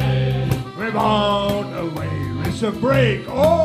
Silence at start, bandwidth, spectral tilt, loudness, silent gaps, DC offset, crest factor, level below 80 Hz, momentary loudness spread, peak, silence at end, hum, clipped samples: 0 s; 15.5 kHz; -6.5 dB/octave; -20 LUFS; none; under 0.1%; 14 dB; -38 dBFS; 8 LU; -4 dBFS; 0 s; none; under 0.1%